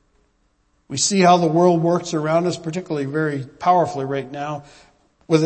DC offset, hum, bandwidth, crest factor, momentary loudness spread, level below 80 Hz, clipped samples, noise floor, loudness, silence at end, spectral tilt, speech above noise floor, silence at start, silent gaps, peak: under 0.1%; none; 8.8 kHz; 18 dB; 14 LU; -60 dBFS; under 0.1%; -64 dBFS; -19 LUFS; 0 s; -5 dB/octave; 45 dB; 0.9 s; none; -2 dBFS